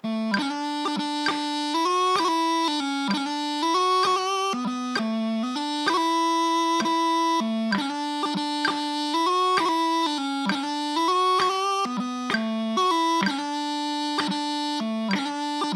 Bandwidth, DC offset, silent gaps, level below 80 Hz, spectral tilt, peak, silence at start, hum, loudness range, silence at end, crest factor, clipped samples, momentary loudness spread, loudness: 14 kHz; under 0.1%; none; -78 dBFS; -3.5 dB/octave; -8 dBFS; 0.05 s; none; 2 LU; 0 s; 16 dB; under 0.1%; 6 LU; -24 LUFS